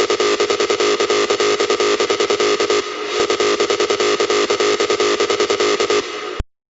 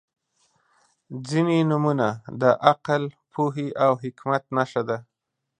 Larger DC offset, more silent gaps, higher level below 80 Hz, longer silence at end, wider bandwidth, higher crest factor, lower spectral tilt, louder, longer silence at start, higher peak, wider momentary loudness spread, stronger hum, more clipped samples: neither; neither; first, -42 dBFS vs -68 dBFS; second, 0.3 s vs 0.55 s; second, 8.2 kHz vs 10 kHz; second, 12 dB vs 22 dB; second, -2 dB/octave vs -7 dB/octave; first, -16 LUFS vs -23 LUFS; second, 0 s vs 1.1 s; about the same, -4 dBFS vs -2 dBFS; second, 4 LU vs 10 LU; neither; neither